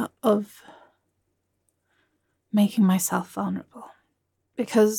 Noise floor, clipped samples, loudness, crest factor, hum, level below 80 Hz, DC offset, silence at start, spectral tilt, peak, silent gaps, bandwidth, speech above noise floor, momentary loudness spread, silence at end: -75 dBFS; under 0.1%; -24 LUFS; 18 dB; none; -76 dBFS; under 0.1%; 0 s; -5.5 dB/octave; -8 dBFS; none; 17.5 kHz; 52 dB; 18 LU; 0 s